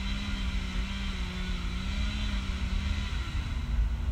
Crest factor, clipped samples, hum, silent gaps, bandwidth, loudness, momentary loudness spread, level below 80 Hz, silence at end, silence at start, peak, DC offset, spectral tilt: 12 dB; under 0.1%; none; none; 10 kHz; -34 LUFS; 3 LU; -32 dBFS; 0 s; 0 s; -18 dBFS; under 0.1%; -5 dB/octave